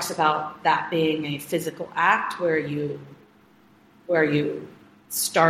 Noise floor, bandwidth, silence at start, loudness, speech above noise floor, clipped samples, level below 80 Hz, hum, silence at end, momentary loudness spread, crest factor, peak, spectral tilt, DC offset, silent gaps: -56 dBFS; 16 kHz; 0 s; -24 LUFS; 32 dB; under 0.1%; -68 dBFS; none; 0 s; 10 LU; 20 dB; -4 dBFS; -4 dB/octave; under 0.1%; none